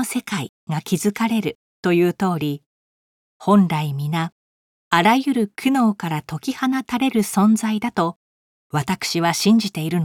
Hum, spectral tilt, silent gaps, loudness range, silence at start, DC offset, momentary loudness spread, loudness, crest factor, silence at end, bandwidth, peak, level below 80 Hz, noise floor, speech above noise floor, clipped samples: none; -5.5 dB/octave; 0.49-0.67 s, 1.55-1.83 s, 2.66-3.40 s, 4.32-4.91 s, 8.16-8.70 s; 2 LU; 0 s; under 0.1%; 11 LU; -20 LUFS; 20 dB; 0 s; 17.5 kHz; 0 dBFS; -62 dBFS; under -90 dBFS; over 71 dB; under 0.1%